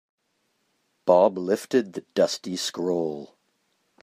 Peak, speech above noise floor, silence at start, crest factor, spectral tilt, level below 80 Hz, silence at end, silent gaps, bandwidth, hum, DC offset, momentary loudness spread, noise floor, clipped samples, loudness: -4 dBFS; 49 dB; 1.05 s; 22 dB; -4.5 dB/octave; -76 dBFS; 0.8 s; none; 15.5 kHz; none; under 0.1%; 11 LU; -73 dBFS; under 0.1%; -24 LUFS